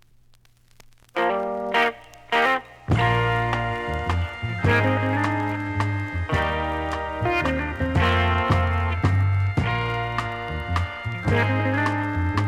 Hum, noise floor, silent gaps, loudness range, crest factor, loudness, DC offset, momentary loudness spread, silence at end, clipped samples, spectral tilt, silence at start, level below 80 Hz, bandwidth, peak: none; -55 dBFS; none; 2 LU; 16 dB; -23 LUFS; under 0.1%; 7 LU; 0 s; under 0.1%; -7 dB/octave; 1.15 s; -36 dBFS; 10.5 kHz; -8 dBFS